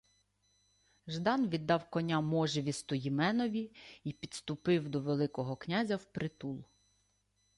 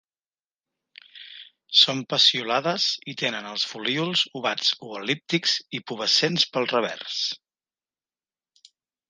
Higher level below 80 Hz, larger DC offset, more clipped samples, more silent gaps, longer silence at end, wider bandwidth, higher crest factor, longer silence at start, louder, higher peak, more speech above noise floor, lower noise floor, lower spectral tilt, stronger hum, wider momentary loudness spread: first, -70 dBFS vs -78 dBFS; neither; neither; neither; second, 0.95 s vs 1.75 s; about the same, 11.5 kHz vs 11 kHz; second, 18 dB vs 24 dB; about the same, 1.05 s vs 1.15 s; second, -35 LUFS vs -22 LUFS; second, -18 dBFS vs -2 dBFS; second, 42 dB vs over 65 dB; second, -76 dBFS vs under -90 dBFS; first, -6 dB/octave vs -2.5 dB/octave; first, 50 Hz at -70 dBFS vs none; about the same, 12 LU vs 12 LU